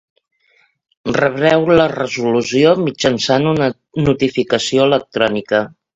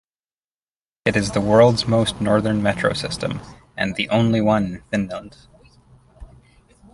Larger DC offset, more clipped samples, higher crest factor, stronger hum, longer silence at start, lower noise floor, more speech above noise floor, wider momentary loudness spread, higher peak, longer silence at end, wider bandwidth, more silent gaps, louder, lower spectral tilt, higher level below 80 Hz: neither; neither; about the same, 16 dB vs 18 dB; neither; about the same, 1.05 s vs 1.05 s; second, -58 dBFS vs under -90 dBFS; second, 43 dB vs over 71 dB; second, 6 LU vs 13 LU; about the same, 0 dBFS vs -2 dBFS; second, 0.3 s vs 0.65 s; second, 8 kHz vs 11.5 kHz; neither; first, -15 LUFS vs -20 LUFS; about the same, -5 dB/octave vs -6 dB/octave; about the same, -48 dBFS vs -46 dBFS